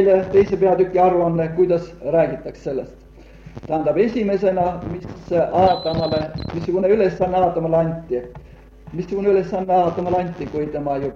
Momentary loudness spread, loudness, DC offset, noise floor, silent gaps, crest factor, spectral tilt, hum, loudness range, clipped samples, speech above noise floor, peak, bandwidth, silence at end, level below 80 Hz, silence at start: 13 LU; -19 LUFS; under 0.1%; -42 dBFS; none; 16 dB; -8.5 dB/octave; none; 3 LU; under 0.1%; 23 dB; -2 dBFS; 7 kHz; 0 s; -44 dBFS; 0 s